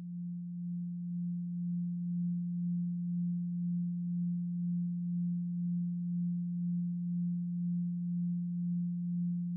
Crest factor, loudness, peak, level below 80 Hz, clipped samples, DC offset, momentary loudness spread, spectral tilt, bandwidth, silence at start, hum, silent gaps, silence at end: 6 dB; -36 LUFS; -30 dBFS; -82 dBFS; under 0.1%; under 0.1%; 3 LU; -27.5 dB/octave; 0.3 kHz; 0 s; none; none; 0 s